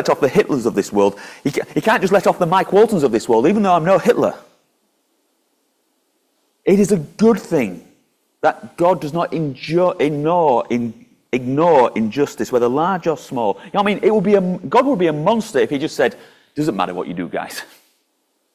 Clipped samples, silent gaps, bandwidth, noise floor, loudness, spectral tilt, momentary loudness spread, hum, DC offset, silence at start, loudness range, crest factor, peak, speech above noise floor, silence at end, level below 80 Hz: under 0.1%; none; 15.5 kHz; -67 dBFS; -17 LUFS; -6 dB/octave; 9 LU; none; under 0.1%; 0 s; 5 LU; 16 dB; -2 dBFS; 50 dB; 0.9 s; -56 dBFS